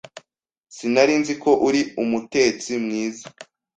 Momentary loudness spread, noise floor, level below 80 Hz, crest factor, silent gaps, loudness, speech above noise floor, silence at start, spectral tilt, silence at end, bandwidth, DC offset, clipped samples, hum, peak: 12 LU; -47 dBFS; -62 dBFS; 20 dB; none; -21 LUFS; 26 dB; 0.15 s; -4 dB/octave; 0.35 s; 9.2 kHz; under 0.1%; under 0.1%; none; -2 dBFS